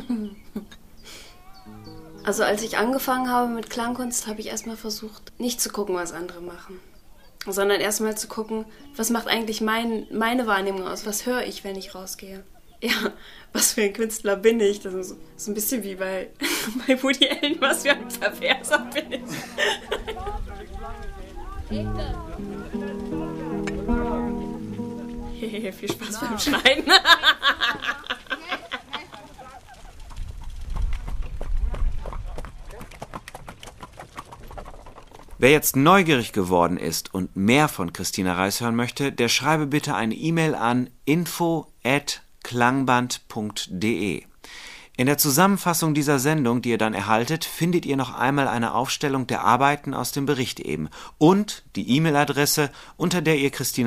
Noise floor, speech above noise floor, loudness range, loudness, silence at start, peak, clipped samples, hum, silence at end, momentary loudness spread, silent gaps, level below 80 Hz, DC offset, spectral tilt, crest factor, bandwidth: -44 dBFS; 21 dB; 13 LU; -23 LUFS; 0 s; 0 dBFS; under 0.1%; none; 0 s; 20 LU; none; -38 dBFS; under 0.1%; -3.5 dB/octave; 24 dB; 15.5 kHz